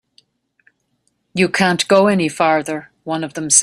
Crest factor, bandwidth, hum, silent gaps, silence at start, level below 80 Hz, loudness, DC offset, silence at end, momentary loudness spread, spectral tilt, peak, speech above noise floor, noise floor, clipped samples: 18 dB; 14 kHz; none; none; 1.35 s; -60 dBFS; -16 LUFS; under 0.1%; 0 s; 13 LU; -3 dB/octave; 0 dBFS; 51 dB; -67 dBFS; under 0.1%